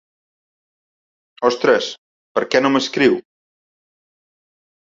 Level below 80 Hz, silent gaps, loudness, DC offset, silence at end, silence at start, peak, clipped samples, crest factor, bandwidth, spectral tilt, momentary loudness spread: -64 dBFS; 1.98-2.35 s; -18 LUFS; under 0.1%; 1.65 s; 1.4 s; -2 dBFS; under 0.1%; 20 dB; 7.8 kHz; -4 dB/octave; 9 LU